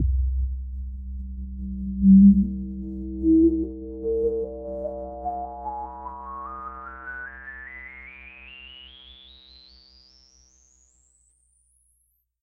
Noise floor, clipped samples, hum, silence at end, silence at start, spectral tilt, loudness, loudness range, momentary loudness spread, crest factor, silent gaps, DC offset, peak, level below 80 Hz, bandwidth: -70 dBFS; under 0.1%; 60 Hz at -60 dBFS; 3.3 s; 0 s; -9.5 dB/octave; -24 LUFS; 22 LU; 24 LU; 20 dB; none; under 0.1%; -6 dBFS; -34 dBFS; 5.6 kHz